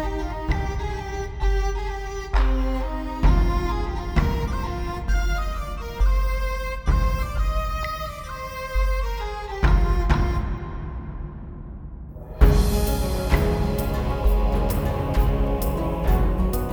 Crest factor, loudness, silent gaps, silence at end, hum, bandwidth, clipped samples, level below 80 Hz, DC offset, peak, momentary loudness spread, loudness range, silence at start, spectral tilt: 20 dB; -25 LUFS; none; 0 s; none; over 20 kHz; under 0.1%; -24 dBFS; under 0.1%; -2 dBFS; 11 LU; 3 LU; 0 s; -6.5 dB/octave